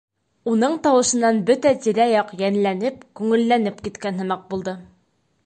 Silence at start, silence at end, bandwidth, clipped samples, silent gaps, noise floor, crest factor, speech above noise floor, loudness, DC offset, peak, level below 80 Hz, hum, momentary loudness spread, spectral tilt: 0.45 s; 0.6 s; 9 kHz; under 0.1%; none; -65 dBFS; 14 dB; 46 dB; -20 LUFS; under 0.1%; -6 dBFS; -58 dBFS; none; 11 LU; -4.5 dB/octave